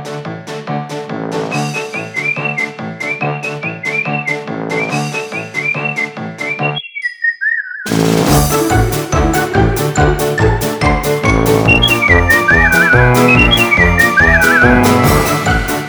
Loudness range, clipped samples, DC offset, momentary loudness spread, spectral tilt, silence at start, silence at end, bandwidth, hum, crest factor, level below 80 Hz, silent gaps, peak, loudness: 10 LU; under 0.1%; under 0.1%; 12 LU; -4.5 dB/octave; 0 s; 0 s; over 20 kHz; none; 12 dB; -24 dBFS; none; 0 dBFS; -12 LUFS